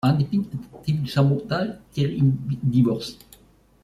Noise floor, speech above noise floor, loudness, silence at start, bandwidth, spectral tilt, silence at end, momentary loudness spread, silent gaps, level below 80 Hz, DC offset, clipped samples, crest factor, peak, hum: -55 dBFS; 33 dB; -23 LUFS; 0.05 s; 13 kHz; -8 dB/octave; 0.7 s; 9 LU; none; -52 dBFS; under 0.1%; under 0.1%; 16 dB; -6 dBFS; none